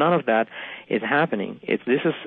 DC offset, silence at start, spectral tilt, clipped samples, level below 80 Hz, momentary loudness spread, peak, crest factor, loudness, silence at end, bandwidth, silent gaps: under 0.1%; 0 s; -10 dB/octave; under 0.1%; -76 dBFS; 8 LU; -8 dBFS; 16 dB; -23 LUFS; 0 s; 4.4 kHz; none